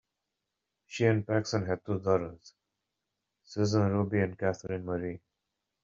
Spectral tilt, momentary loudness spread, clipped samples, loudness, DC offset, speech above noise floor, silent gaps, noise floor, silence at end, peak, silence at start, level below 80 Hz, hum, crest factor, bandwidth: -6.5 dB/octave; 13 LU; under 0.1%; -31 LUFS; under 0.1%; 56 dB; none; -86 dBFS; 0.65 s; -12 dBFS; 0.9 s; -66 dBFS; none; 20 dB; 7.6 kHz